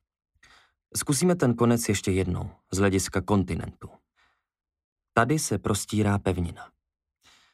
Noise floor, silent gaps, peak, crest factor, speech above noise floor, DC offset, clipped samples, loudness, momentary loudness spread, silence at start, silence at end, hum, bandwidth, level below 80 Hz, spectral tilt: -69 dBFS; 4.84-4.96 s; -6 dBFS; 22 dB; 44 dB; under 0.1%; under 0.1%; -26 LUFS; 11 LU; 0.95 s; 0.85 s; none; 15.5 kHz; -50 dBFS; -5 dB/octave